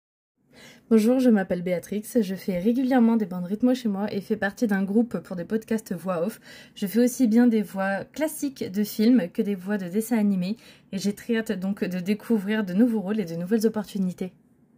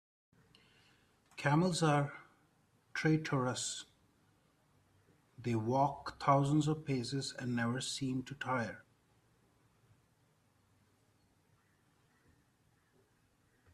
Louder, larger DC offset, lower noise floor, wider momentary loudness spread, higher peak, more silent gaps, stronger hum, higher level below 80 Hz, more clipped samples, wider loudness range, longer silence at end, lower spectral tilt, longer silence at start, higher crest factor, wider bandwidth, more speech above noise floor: first, -25 LUFS vs -35 LUFS; neither; second, -51 dBFS vs -73 dBFS; second, 9 LU vs 13 LU; first, -8 dBFS vs -18 dBFS; neither; neither; first, -64 dBFS vs -70 dBFS; neither; second, 3 LU vs 8 LU; second, 0.5 s vs 4.9 s; about the same, -6.5 dB/octave vs -5.5 dB/octave; second, 0.6 s vs 1.35 s; second, 16 dB vs 22 dB; first, 16 kHz vs 13 kHz; second, 27 dB vs 39 dB